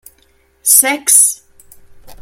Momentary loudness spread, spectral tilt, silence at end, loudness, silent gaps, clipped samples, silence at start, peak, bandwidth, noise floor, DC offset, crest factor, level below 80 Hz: 11 LU; 1.5 dB/octave; 0.05 s; -9 LUFS; none; 0.3%; 0.65 s; 0 dBFS; over 20 kHz; -54 dBFS; under 0.1%; 16 dB; -52 dBFS